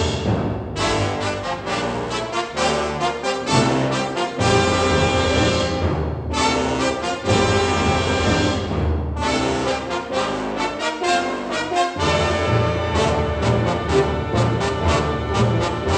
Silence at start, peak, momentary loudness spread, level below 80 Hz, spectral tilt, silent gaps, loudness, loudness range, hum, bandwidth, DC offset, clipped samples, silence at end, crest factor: 0 s; -2 dBFS; 6 LU; -34 dBFS; -5 dB/octave; none; -20 LUFS; 3 LU; none; 10.5 kHz; under 0.1%; under 0.1%; 0 s; 18 dB